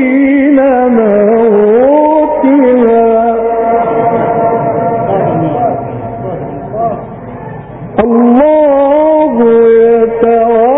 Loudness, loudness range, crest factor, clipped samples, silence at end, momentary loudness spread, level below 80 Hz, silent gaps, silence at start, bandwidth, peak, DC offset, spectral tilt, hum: -8 LUFS; 7 LU; 8 dB; under 0.1%; 0 s; 13 LU; -40 dBFS; none; 0 s; 3.8 kHz; 0 dBFS; under 0.1%; -12.5 dB/octave; none